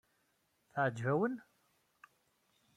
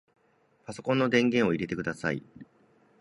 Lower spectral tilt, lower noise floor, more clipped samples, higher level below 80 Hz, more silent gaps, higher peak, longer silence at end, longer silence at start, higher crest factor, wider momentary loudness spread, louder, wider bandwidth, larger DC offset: first, -8 dB/octave vs -6 dB/octave; first, -78 dBFS vs -67 dBFS; neither; second, -82 dBFS vs -62 dBFS; neither; second, -22 dBFS vs -10 dBFS; first, 1.35 s vs 0.55 s; about the same, 0.75 s vs 0.7 s; about the same, 20 dB vs 20 dB; second, 11 LU vs 15 LU; second, -36 LUFS vs -28 LUFS; first, 13.5 kHz vs 11.5 kHz; neither